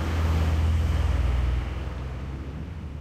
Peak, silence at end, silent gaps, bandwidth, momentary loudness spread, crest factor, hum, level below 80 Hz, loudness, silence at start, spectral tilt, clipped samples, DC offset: -14 dBFS; 0 s; none; 9.2 kHz; 11 LU; 12 dB; none; -28 dBFS; -28 LUFS; 0 s; -7 dB/octave; under 0.1%; under 0.1%